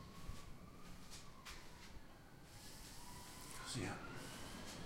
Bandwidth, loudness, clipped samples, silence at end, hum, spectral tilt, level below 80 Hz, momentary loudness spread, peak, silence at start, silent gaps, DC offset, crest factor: 16 kHz; -53 LUFS; under 0.1%; 0 s; none; -3.5 dB/octave; -60 dBFS; 13 LU; -32 dBFS; 0 s; none; under 0.1%; 20 dB